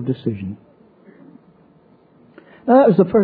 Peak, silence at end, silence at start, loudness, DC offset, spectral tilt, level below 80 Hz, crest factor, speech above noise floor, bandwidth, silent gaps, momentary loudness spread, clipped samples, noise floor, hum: -2 dBFS; 0 s; 0 s; -16 LUFS; under 0.1%; -12.5 dB/octave; -58 dBFS; 18 dB; 37 dB; 4.8 kHz; none; 20 LU; under 0.1%; -52 dBFS; none